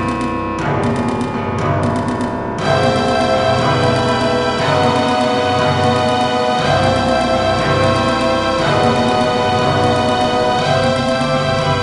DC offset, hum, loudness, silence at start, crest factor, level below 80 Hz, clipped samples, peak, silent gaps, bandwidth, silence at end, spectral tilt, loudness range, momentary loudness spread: under 0.1%; none; -15 LUFS; 0 s; 14 dB; -36 dBFS; under 0.1%; 0 dBFS; none; 11.5 kHz; 0 s; -5.5 dB/octave; 2 LU; 5 LU